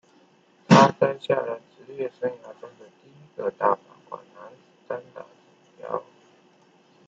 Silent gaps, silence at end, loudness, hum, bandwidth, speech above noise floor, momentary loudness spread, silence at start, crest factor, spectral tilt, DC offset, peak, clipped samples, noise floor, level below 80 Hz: none; 1.05 s; -24 LUFS; none; 8 kHz; 31 dB; 27 LU; 0.7 s; 26 dB; -6 dB/octave; under 0.1%; -2 dBFS; under 0.1%; -59 dBFS; -68 dBFS